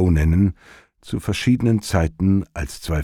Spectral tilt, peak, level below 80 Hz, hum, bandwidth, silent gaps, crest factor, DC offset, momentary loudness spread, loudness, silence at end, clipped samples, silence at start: -7 dB/octave; -6 dBFS; -30 dBFS; none; 15.5 kHz; none; 14 dB; under 0.1%; 12 LU; -20 LUFS; 0 s; under 0.1%; 0 s